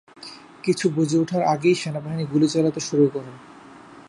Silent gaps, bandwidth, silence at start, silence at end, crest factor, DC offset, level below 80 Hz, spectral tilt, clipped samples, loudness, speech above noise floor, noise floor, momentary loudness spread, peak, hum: none; 11.5 kHz; 0.2 s; 0.1 s; 16 dB; under 0.1%; -66 dBFS; -6 dB/octave; under 0.1%; -22 LUFS; 24 dB; -45 dBFS; 19 LU; -6 dBFS; none